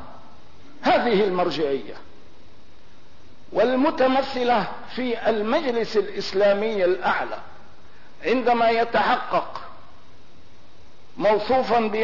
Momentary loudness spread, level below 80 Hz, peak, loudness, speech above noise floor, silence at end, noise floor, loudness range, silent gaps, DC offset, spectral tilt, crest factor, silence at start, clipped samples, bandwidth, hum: 11 LU; -58 dBFS; -10 dBFS; -22 LUFS; 31 dB; 0 s; -52 dBFS; 3 LU; none; 2%; -5.5 dB/octave; 14 dB; 0 s; under 0.1%; 6 kHz; none